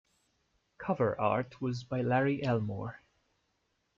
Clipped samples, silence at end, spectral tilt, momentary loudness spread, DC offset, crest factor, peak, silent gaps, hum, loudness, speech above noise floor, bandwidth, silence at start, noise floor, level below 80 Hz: under 0.1%; 1 s; -8 dB/octave; 11 LU; under 0.1%; 20 dB; -14 dBFS; none; none; -32 LUFS; 47 dB; 7.4 kHz; 0.8 s; -78 dBFS; -66 dBFS